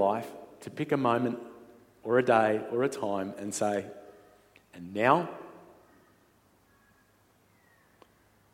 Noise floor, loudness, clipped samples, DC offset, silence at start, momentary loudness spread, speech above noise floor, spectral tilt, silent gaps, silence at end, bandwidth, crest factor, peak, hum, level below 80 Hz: -65 dBFS; -29 LUFS; under 0.1%; under 0.1%; 0 s; 21 LU; 37 dB; -5.5 dB/octave; none; 2.95 s; 16.5 kHz; 24 dB; -8 dBFS; none; -76 dBFS